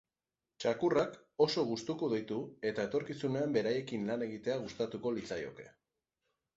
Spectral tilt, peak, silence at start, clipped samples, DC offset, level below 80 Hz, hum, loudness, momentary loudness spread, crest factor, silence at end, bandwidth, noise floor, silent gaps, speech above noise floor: -5 dB/octave; -16 dBFS; 0.6 s; under 0.1%; under 0.1%; -72 dBFS; none; -35 LUFS; 8 LU; 20 dB; 0.85 s; 8 kHz; under -90 dBFS; none; over 55 dB